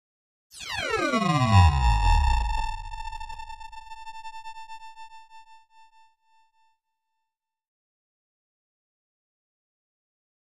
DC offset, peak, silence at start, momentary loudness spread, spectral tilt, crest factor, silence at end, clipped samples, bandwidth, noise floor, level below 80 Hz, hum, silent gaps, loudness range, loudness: under 0.1%; -8 dBFS; 0.55 s; 24 LU; -5.5 dB/octave; 20 dB; 4.9 s; under 0.1%; 11.5 kHz; -83 dBFS; -32 dBFS; none; none; 22 LU; -24 LUFS